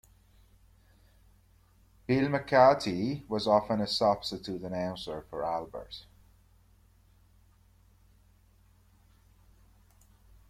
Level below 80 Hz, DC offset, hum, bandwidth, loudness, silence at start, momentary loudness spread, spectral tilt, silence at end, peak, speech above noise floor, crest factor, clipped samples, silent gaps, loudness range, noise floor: -60 dBFS; under 0.1%; none; 14 kHz; -29 LUFS; 2.1 s; 19 LU; -6 dB/octave; 4.5 s; -10 dBFS; 34 dB; 24 dB; under 0.1%; none; 14 LU; -63 dBFS